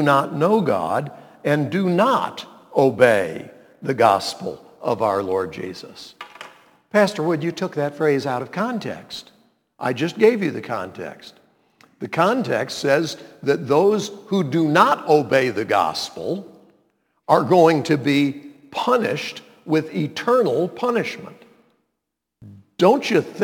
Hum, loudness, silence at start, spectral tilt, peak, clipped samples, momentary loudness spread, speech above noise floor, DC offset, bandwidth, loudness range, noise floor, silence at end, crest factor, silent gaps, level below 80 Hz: none; -20 LUFS; 0 s; -6 dB/octave; 0 dBFS; under 0.1%; 17 LU; 60 dB; under 0.1%; 19 kHz; 5 LU; -80 dBFS; 0 s; 20 dB; none; -68 dBFS